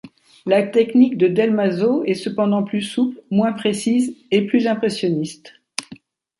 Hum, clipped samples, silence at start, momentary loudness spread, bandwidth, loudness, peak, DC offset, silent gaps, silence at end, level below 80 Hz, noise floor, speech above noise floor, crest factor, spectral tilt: none; under 0.1%; 0.05 s; 12 LU; 11.5 kHz; -19 LUFS; -2 dBFS; under 0.1%; none; 0.45 s; -66 dBFS; -44 dBFS; 26 dB; 16 dB; -6 dB/octave